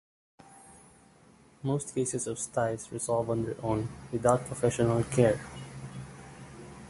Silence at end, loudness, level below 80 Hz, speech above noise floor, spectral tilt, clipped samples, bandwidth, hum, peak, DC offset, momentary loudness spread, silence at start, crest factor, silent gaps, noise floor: 0 s; -30 LUFS; -56 dBFS; 29 dB; -6 dB/octave; under 0.1%; 11.5 kHz; none; -8 dBFS; under 0.1%; 18 LU; 0.5 s; 24 dB; none; -59 dBFS